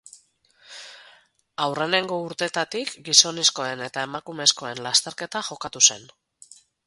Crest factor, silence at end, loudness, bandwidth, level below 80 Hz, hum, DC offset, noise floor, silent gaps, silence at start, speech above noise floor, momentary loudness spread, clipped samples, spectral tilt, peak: 26 dB; 0.8 s; -21 LUFS; 16 kHz; -70 dBFS; none; under 0.1%; -59 dBFS; none; 0.7 s; 35 dB; 22 LU; under 0.1%; -0.5 dB/octave; 0 dBFS